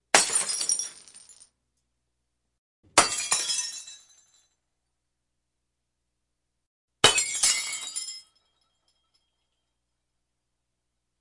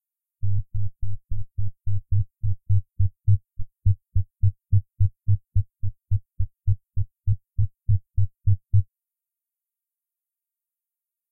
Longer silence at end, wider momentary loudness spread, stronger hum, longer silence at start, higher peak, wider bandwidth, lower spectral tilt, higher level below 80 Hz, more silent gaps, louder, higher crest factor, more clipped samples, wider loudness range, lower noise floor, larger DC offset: first, 3 s vs 2.5 s; first, 17 LU vs 10 LU; first, 60 Hz at -80 dBFS vs none; second, 0.15 s vs 0.45 s; first, -4 dBFS vs -8 dBFS; first, 11.5 kHz vs 0.3 kHz; second, 0.5 dB/octave vs -14.5 dB/octave; second, -66 dBFS vs -34 dBFS; first, 2.58-2.83 s, 6.66-6.88 s vs none; first, -23 LUFS vs -27 LUFS; first, 28 dB vs 14 dB; neither; first, 10 LU vs 3 LU; second, -82 dBFS vs -89 dBFS; neither